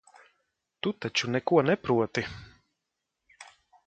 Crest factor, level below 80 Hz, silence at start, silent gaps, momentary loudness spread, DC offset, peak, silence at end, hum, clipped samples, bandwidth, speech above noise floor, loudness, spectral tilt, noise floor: 22 dB; -62 dBFS; 0.85 s; none; 11 LU; under 0.1%; -8 dBFS; 0.4 s; none; under 0.1%; 9 kHz; 57 dB; -28 LUFS; -5 dB/octave; -84 dBFS